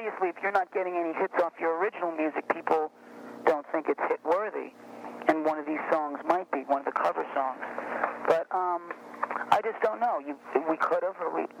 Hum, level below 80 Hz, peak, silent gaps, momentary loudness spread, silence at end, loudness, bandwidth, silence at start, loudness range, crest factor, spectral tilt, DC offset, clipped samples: none; -78 dBFS; -8 dBFS; none; 8 LU; 0 s; -29 LUFS; 15 kHz; 0 s; 1 LU; 22 dB; -5.5 dB/octave; under 0.1%; under 0.1%